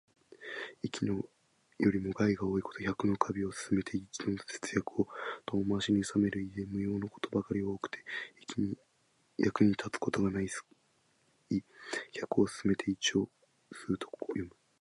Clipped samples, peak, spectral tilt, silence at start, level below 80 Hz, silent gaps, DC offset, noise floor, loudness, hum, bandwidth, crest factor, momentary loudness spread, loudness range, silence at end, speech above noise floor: under 0.1%; -12 dBFS; -5.5 dB/octave; 0.3 s; -60 dBFS; none; under 0.1%; -72 dBFS; -34 LUFS; none; 11.5 kHz; 22 dB; 10 LU; 2 LU; 0.35 s; 39 dB